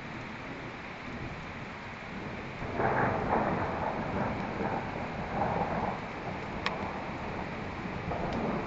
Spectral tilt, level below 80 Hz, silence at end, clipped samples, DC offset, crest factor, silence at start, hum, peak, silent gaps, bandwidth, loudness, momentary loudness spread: -5 dB/octave; -50 dBFS; 0 s; under 0.1%; under 0.1%; 22 dB; 0 s; none; -12 dBFS; none; 7.6 kHz; -34 LUFS; 11 LU